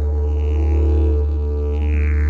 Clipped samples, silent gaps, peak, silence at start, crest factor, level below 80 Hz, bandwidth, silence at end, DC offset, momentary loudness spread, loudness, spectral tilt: under 0.1%; none; -8 dBFS; 0 s; 8 dB; -18 dBFS; 3.1 kHz; 0 s; under 0.1%; 4 LU; -19 LUFS; -10 dB/octave